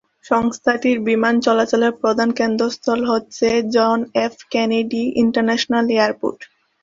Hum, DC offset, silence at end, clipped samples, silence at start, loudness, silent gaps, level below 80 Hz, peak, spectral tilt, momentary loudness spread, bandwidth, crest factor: none; under 0.1%; 0.4 s; under 0.1%; 0.25 s; -18 LUFS; none; -58 dBFS; -2 dBFS; -4.5 dB/octave; 5 LU; 7.6 kHz; 16 dB